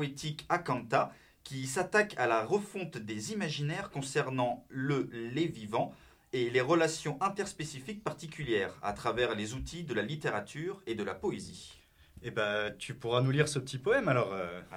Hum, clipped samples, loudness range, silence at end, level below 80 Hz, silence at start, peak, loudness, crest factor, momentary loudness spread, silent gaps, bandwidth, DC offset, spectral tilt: none; under 0.1%; 3 LU; 0 s; -60 dBFS; 0 s; -12 dBFS; -33 LUFS; 22 dB; 11 LU; none; 16 kHz; under 0.1%; -5 dB/octave